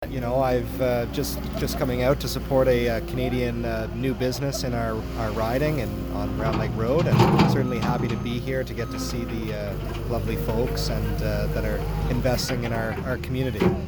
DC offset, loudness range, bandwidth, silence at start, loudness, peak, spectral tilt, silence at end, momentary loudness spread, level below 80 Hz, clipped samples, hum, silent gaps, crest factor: under 0.1%; 4 LU; over 20 kHz; 0 s; -25 LUFS; -6 dBFS; -6.5 dB/octave; 0 s; 8 LU; -34 dBFS; under 0.1%; none; none; 18 dB